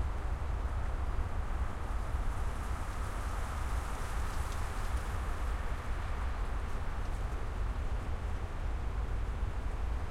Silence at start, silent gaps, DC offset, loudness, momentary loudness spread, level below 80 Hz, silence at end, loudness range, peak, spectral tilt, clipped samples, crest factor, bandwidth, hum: 0 s; none; under 0.1%; -39 LUFS; 2 LU; -36 dBFS; 0 s; 1 LU; -22 dBFS; -6 dB/octave; under 0.1%; 12 dB; 14.5 kHz; none